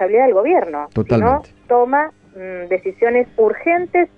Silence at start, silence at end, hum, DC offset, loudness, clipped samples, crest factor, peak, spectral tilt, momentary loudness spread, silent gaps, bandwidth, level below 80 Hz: 0 s; 0.1 s; none; under 0.1%; -16 LUFS; under 0.1%; 12 dB; -4 dBFS; -9.5 dB/octave; 10 LU; none; 5.2 kHz; -44 dBFS